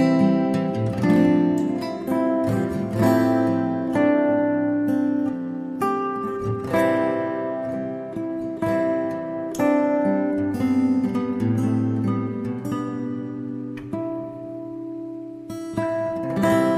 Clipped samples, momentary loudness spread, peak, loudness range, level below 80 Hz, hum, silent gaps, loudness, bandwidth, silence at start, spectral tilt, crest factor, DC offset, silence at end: under 0.1%; 12 LU; -6 dBFS; 8 LU; -56 dBFS; none; none; -23 LUFS; 14.5 kHz; 0 s; -8 dB/octave; 16 dB; under 0.1%; 0 s